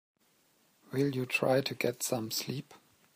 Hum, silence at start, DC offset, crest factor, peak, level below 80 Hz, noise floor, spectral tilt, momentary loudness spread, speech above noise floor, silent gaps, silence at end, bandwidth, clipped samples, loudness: none; 0.9 s; under 0.1%; 20 dB; -16 dBFS; -76 dBFS; -70 dBFS; -4.5 dB/octave; 10 LU; 38 dB; none; 0.4 s; 15.5 kHz; under 0.1%; -32 LUFS